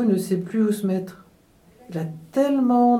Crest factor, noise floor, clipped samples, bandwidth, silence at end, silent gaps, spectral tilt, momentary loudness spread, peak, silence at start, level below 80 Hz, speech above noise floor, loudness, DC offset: 14 dB; -55 dBFS; under 0.1%; 14.5 kHz; 0 s; none; -7.5 dB/octave; 12 LU; -8 dBFS; 0 s; -64 dBFS; 34 dB; -23 LUFS; under 0.1%